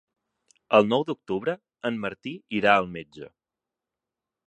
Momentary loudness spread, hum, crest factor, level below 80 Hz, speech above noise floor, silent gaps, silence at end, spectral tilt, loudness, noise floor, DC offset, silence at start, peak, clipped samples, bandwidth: 17 LU; none; 24 dB; -66 dBFS; 64 dB; none; 1.2 s; -6.5 dB/octave; -25 LUFS; -89 dBFS; under 0.1%; 0.7 s; -4 dBFS; under 0.1%; 9.8 kHz